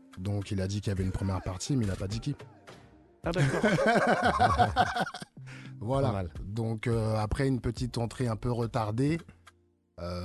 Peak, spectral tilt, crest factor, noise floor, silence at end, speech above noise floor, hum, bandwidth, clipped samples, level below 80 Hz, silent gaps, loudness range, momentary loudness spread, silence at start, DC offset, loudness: -10 dBFS; -6 dB/octave; 20 dB; -64 dBFS; 0 s; 34 dB; none; 12.5 kHz; under 0.1%; -44 dBFS; none; 5 LU; 14 LU; 0.15 s; under 0.1%; -30 LUFS